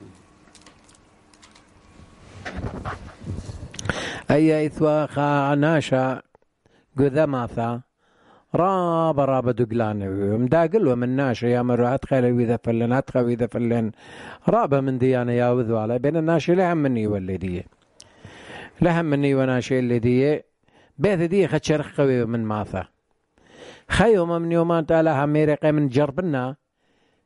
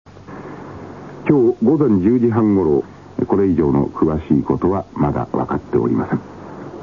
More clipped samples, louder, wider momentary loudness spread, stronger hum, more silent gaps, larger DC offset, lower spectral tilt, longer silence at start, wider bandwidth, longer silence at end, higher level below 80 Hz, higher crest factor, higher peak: neither; second, -21 LUFS vs -17 LUFS; second, 13 LU vs 19 LU; neither; neither; second, under 0.1% vs 0.2%; second, -7.5 dB/octave vs -10.5 dB/octave; second, 0 s vs 0.15 s; first, 11.5 kHz vs 7 kHz; first, 0.7 s vs 0 s; about the same, -46 dBFS vs -42 dBFS; about the same, 20 dB vs 16 dB; about the same, -2 dBFS vs 0 dBFS